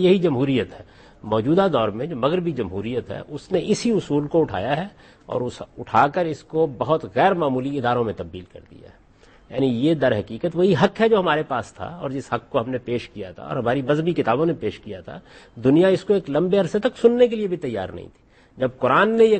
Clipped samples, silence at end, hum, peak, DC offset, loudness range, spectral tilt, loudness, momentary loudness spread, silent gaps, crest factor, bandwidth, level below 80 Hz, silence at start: under 0.1%; 0 s; none; -4 dBFS; under 0.1%; 4 LU; -7 dB/octave; -21 LUFS; 15 LU; none; 18 dB; 8.8 kHz; -54 dBFS; 0 s